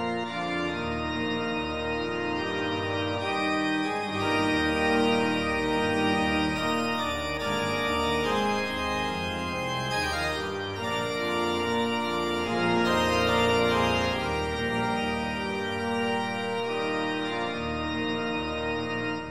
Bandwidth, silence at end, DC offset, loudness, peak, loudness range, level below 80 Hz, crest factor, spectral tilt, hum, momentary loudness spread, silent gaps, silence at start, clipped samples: 16.5 kHz; 0 s; 0.3%; -27 LUFS; -12 dBFS; 4 LU; -48 dBFS; 16 dB; -5 dB/octave; none; 6 LU; none; 0 s; under 0.1%